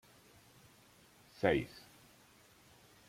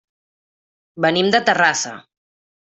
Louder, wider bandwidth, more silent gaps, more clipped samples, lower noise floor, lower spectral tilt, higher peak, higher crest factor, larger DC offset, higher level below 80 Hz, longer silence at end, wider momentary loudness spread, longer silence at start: second, -36 LUFS vs -17 LUFS; first, 16.5 kHz vs 8.4 kHz; neither; neither; second, -64 dBFS vs under -90 dBFS; first, -6 dB/octave vs -3 dB/octave; second, -16 dBFS vs -2 dBFS; first, 26 dB vs 18 dB; neither; about the same, -66 dBFS vs -64 dBFS; first, 1.3 s vs 0.65 s; first, 28 LU vs 8 LU; first, 1.4 s vs 0.95 s